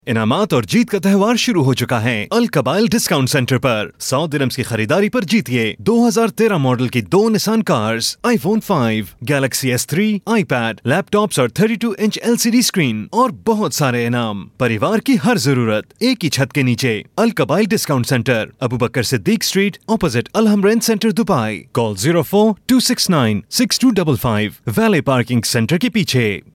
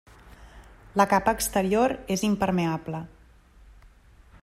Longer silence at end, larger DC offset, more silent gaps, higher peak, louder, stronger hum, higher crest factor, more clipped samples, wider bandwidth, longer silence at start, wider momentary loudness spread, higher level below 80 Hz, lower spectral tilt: second, 0.15 s vs 1.35 s; neither; neither; about the same, -4 dBFS vs -6 dBFS; first, -16 LUFS vs -25 LUFS; neither; second, 12 dB vs 22 dB; neither; about the same, 17 kHz vs 16 kHz; second, 0.05 s vs 0.25 s; second, 5 LU vs 13 LU; about the same, -50 dBFS vs -50 dBFS; about the same, -5 dB/octave vs -5 dB/octave